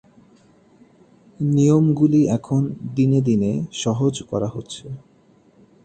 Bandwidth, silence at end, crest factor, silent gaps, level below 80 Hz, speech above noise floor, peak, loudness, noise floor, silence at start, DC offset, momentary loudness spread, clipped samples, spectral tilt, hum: 9 kHz; 0.85 s; 16 dB; none; -54 dBFS; 36 dB; -4 dBFS; -19 LUFS; -54 dBFS; 1.4 s; under 0.1%; 17 LU; under 0.1%; -7.5 dB/octave; none